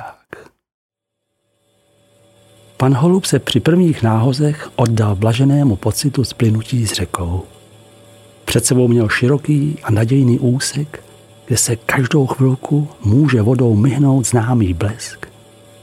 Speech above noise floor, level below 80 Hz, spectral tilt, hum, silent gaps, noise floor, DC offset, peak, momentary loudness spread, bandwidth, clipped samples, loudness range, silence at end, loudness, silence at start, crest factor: 60 dB; -44 dBFS; -5.5 dB/octave; none; 0.74-0.89 s; -74 dBFS; under 0.1%; 0 dBFS; 8 LU; 15.5 kHz; under 0.1%; 4 LU; 0.55 s; -15 LUFS; 0 s; 16 dB